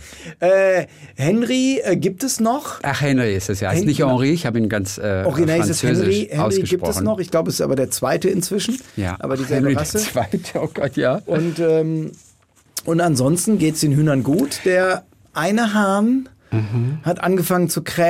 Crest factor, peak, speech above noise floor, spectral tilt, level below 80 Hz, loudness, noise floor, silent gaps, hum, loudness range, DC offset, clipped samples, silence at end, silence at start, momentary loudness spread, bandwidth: 14 dB; -4 dBFS; 36 dB; -5.5 dB/octave; -52 dBFS; -19 LUFS; -54 dBFS; none; none; 3 LU; under 0.1%; under 0.1%; 0 s; 0 s; 7 LU; 16 kHz